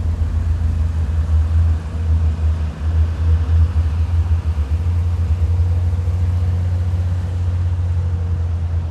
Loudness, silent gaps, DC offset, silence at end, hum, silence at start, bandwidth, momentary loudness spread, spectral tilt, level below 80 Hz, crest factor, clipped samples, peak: -19 LUFS; none; under 0.1%; 0 s; none; 0 s; 5.2 kHz; 4 LU; -8.5 dB/octave; -24 dBFS; 10 dB; under 0.1%; -6 dBFS